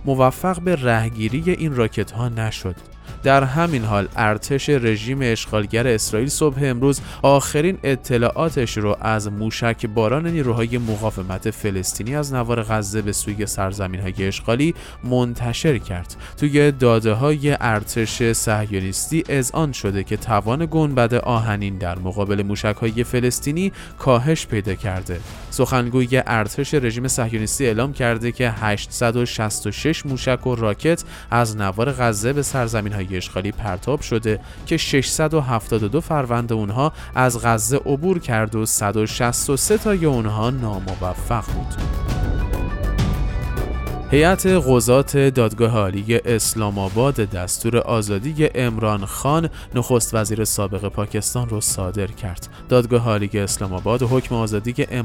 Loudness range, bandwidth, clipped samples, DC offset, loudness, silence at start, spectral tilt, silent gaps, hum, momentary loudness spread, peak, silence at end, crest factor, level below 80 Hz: 4 LU; 17.5 kHz; under 0.1%; under 0.1%; -20 LUFS; 0 s; -5 dB/octave; none; none; 8 LU; -2 dBFS; 0 s; 18 dB; -34 dBFS